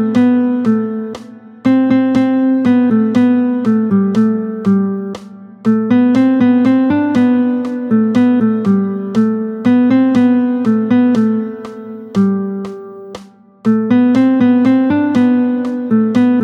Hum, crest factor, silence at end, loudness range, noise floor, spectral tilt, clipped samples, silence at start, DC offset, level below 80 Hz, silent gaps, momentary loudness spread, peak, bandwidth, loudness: none; 10 dB; 0 s; 3 LU; -36 dBFS; -8.5 dB/octave; under 0.1%; 0 s; under 0.1%; -56 dBFS; none; 11 LU; -2 dBFS; 6.4 kHz; -13 LUFS